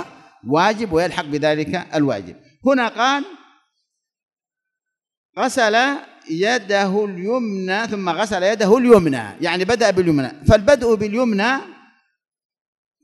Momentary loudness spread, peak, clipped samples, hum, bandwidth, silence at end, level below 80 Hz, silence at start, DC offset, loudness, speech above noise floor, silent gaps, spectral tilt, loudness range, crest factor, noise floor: 9 LU; 0 dBFS; under 0.1%; none; 12 kHz; 1.3 s; -42 dBFS; 0 s; under 0.1%; -18 LUFS; 67 dB; 4.23-4.28 s, 5.17-5.33 s; -5 dB/octave; 7 LU; 18 dB; -85 dBFS